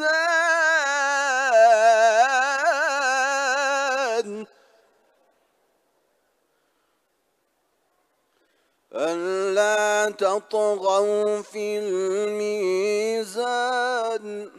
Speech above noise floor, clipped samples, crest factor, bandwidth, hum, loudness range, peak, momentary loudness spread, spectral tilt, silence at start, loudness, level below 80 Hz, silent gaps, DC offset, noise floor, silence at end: 47 dB; under 0.1%; 18 dB; 13 kHz; none; 12 LU; -6 dBFS; 10 LU; -2 dB/octave; 0 s; -21 LUFS; -84 dBFS; none; under 0.1%; -71 dBFS; 0.1 s